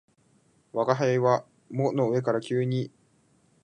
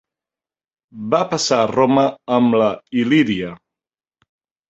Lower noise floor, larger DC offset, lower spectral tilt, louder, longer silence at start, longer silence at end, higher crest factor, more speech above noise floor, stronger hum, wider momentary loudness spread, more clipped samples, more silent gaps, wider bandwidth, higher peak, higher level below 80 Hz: second, -64 dBFS vs under -90 dBFS; neither; first, -7.5 dB/octave vs -5 dB/octave; second, -27 LUFS vs -17 LUFS; second, 0.75 s vs 0.95 s; second, 0.75 s vs 1.15 s; about the same, 20 dB vs 18 dB; second, 39 dB vs over 73 dB; neither; first, 11 LU vs 7 LU; neither; neither; first, 9.8 kHz vs 8.2 kHz; second, -6 dBFS vs -2 dBFS; second, -74 dBFS vs -58 dBFS